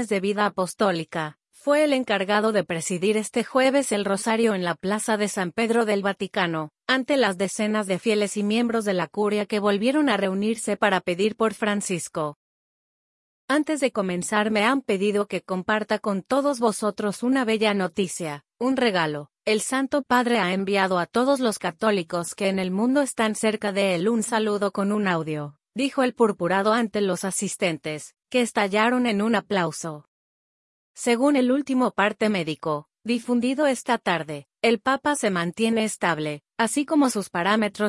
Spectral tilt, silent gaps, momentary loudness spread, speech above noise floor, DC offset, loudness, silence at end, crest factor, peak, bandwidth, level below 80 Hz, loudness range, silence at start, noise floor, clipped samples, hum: -4.5 dB/octave; 12.36-13.48 s, 30.08-30.94 s; 7 LU; over 67 dB; under 0.1%; -23 LUFS; 0 s; 18 dB; -6 dBFS; 12 kHz; -68 dBFS; 2 LU; 0 s; under -90 dBFS; under 0.1%; none